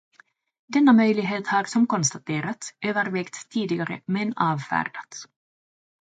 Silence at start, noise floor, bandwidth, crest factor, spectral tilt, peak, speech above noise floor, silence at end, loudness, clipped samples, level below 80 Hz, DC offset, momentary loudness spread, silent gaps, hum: 0.7 s; under -90 dBFS; 9.4 kHz; 18 dB; -4.5 dB/octave; -6 dBFS; over 67 dB; 0.75 s; -24 LUFS; under 0.1%; -70 dBFS; under 0.1%; 13 LU; none; none